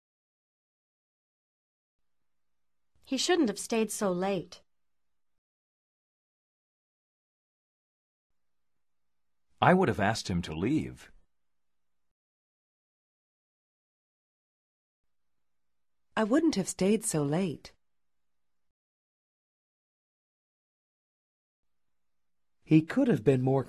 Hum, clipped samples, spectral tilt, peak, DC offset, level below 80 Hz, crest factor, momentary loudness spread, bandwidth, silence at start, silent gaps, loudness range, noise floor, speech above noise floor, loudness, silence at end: none; under 0.1%; -5.5 dB/octave; -8 dBFS; under 0.1%; -60 dBFS; 26 dB; 9 LU; 13 kHz; 3.1 s; 5.38-8.30 s, 12.11-15.04 s, 18.71-21.63 s; 8 LU; under -90 dBFS; over 62 dB; -28 LUFS; 0 s